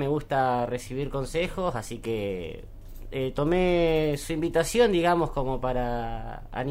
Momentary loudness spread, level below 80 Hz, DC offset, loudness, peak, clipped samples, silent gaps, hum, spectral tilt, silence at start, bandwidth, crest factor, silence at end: 13 LU; -38 dBFS; under 0.1%; -27 LUFS; -10 dBFS; under 0.1%; none; none; -5.5 dB/octave; 0 s; 16 kHz; 16 dB; 0 s